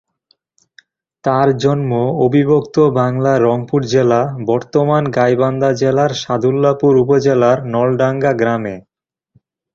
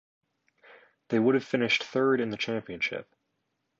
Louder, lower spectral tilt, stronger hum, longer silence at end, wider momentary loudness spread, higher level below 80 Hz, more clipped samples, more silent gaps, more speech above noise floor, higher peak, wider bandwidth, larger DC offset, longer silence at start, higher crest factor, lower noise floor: first, -14 LUFS vs -27 LUFS; first, -7 dB/octave vs -5.5 dB/octave; neither; first, 0.95 s vs 0.8 s; about the same, 5 LU vs 7 LU; first, -52 dBFS vs -72 dBFS; neither; neither; second, 48 dB vs 52 dB; first, -2 dBFS vs -12 dBFS; about the same, 7.6 kHz vs 7.4 kHz; neither; first, 1.25 s vs 1.1 s; about the same, 14 dB vs 18 dB; second, -61 dBFS vs -79 dBFS